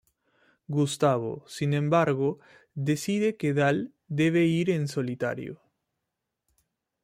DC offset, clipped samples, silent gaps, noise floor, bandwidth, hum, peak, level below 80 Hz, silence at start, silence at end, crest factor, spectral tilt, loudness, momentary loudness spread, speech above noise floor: under 0.1%; under 0.1%; none; -84 dBFS; 15.5 kHz; none; -10 dBFS; -68 dBFS; 0.7 s; 1.5 s; 18 dB; -6.5 dB/octave; -27 LUFS; 10 LU; 58 dB